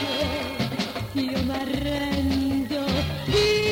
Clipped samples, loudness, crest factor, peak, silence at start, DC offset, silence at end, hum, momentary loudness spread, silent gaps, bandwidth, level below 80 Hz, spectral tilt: under 0.1%; -25 LUFS; 18 dB; -8 dBFS; 0 s; under 0.1%; 0 s; none; 6 LU; none; 19.5 kHz; -40 dBFS; -5 dB/octave